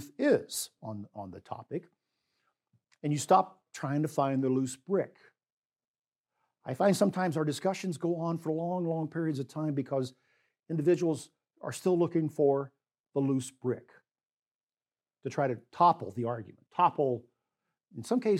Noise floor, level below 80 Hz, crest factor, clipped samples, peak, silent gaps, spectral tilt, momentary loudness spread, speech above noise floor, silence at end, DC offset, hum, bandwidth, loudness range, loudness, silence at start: under -90 dBFS; -84 dBFS; 20 dB; under 0.1%; -12 dBFS; 5.52-5.70 s, 5.88-5.94 s, 6.08-6.12 s, 6.18-6.24 s, 13.00-13.04 s, 14.25-14.67 s; -6.5 dB/octave; 15 LU; over 60 dB; 0 s; under 0.1%; none; 16 kHz; 3 LU; -31 LUFS; 0 s